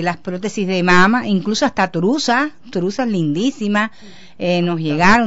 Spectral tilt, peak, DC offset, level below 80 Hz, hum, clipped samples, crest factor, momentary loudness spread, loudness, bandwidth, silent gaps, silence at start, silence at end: -5 dB/octave; -2 dBFS; 1%; -44 dBFS; none; under 0.1%; 16 dB; 10 LU; -17 LUFS; 8 kHz; none; 0 s; 0 s